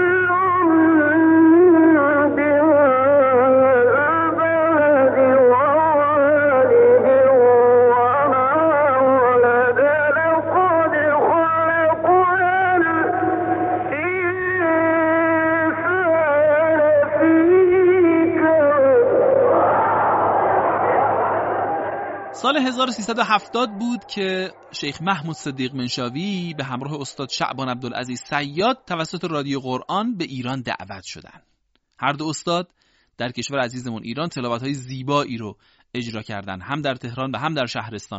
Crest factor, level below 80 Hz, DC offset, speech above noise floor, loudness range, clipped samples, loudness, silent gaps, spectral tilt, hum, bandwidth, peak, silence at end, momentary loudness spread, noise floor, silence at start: 14 dB; -56 dBFS; under 0.1%; 42 dB; 12 LU; under 0.1%; -17 LUFS; none; -4 dB/octave; none; 8 kHz; -4 dBFS; 0 s; 14 LU; -67 dBFS; 0 s